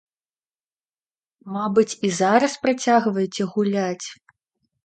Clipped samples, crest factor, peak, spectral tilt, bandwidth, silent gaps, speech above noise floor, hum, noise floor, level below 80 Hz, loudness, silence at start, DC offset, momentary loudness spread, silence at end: under 0.1%; 20 dB; -2 dBFS; -5 dB/octave; 9.2 kHz; none; over 69 dB; none; under -90 dBFS; -68 dBFS; -21 LUFS; 1.45 s; under 0.1%; 10 LU; 0.7 s